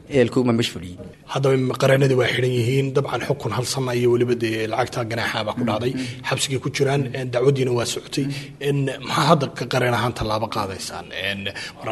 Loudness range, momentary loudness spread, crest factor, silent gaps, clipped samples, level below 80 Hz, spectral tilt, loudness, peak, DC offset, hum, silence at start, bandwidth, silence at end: 2 LU; 9 LU; 20 dB; none; under 0.1%; -50 dBFS; -5.5 dB/octave; -22 LUFS; 0 dBFS; under 0.1%; none; 0 s; 12.5 kHz; 0 s